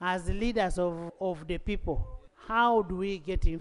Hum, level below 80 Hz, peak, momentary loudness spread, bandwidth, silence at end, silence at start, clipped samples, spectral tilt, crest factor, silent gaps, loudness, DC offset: none; -36 dBFS; -14 dBFS; 10 LU; 11 kHz; 0 s; 0 s; under 0.1%; -6 dB/octave; 16 dB; none; -31 LUFS; under 0.1%